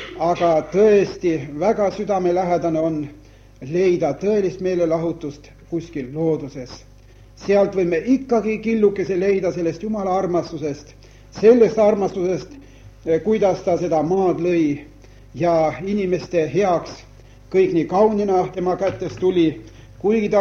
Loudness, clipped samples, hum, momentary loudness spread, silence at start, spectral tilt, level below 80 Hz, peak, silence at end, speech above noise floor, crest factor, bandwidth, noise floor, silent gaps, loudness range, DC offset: -19 LUFS; under 0.1%; none; 13 LU; 0 s; -7 dB/octave; -48 dBFS; -2 dBFS; 0 s; 27 dB; 16 dB; 7 kHz; -45 dBFS; none; 4 LU; under 0.1%